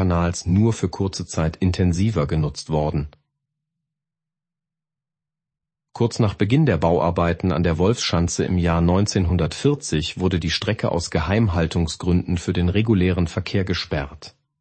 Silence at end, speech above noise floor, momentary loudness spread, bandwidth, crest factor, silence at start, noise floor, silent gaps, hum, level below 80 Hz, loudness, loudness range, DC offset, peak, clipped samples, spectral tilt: 0.3 s; 68 dB; 6 LU; 8.8 kHz; 18 dB; 0 s; -88 dBFS; none; none; -36 dBFS; -21 LUFS; 9 LU; under 0.1%; -4 dBFS; under 0.1%; -6 dB/octave